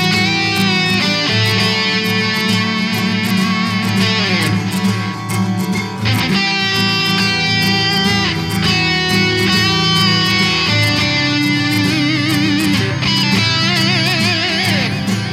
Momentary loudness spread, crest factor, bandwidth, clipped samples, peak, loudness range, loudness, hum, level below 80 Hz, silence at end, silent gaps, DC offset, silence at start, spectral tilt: 4 LU; 14 dB; 16 kHz; under 0.1%; 0 dBFS; 3 LU; -14 LUFS; none; -42 dBFS; 0 s; none; under 0.1%; 0 s; -4 dB/octave